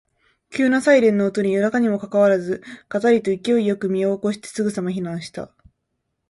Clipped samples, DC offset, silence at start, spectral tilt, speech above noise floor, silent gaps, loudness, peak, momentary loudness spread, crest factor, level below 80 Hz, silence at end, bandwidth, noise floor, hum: under 0.1%; under 0.1%; 0.5 s; -6 dB/octave; 56 dB; none; -20 LUFS; -4 dBFS; 14 LU; 18 dB; -62 dBFS; 0.85 s; 11.5 kHz; -75 dBFS; none